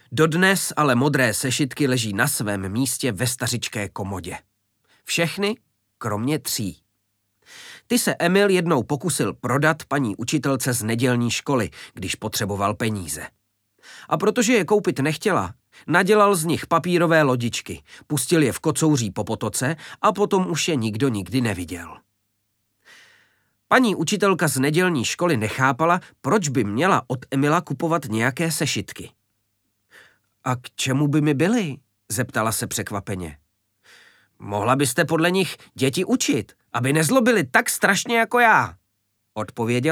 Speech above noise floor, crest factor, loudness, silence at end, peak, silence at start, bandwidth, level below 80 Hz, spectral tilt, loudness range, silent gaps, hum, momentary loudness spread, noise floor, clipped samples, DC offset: 51 dB; 20 dB; -21 LUFS; 0 s; -2 dBFS; 0.1 s; 19 kHz; -58 dBFS; -4.5 dB/octave; 6 LU; none; none; 12 LU; -72 dBFS; under 0.1%; under 0.1%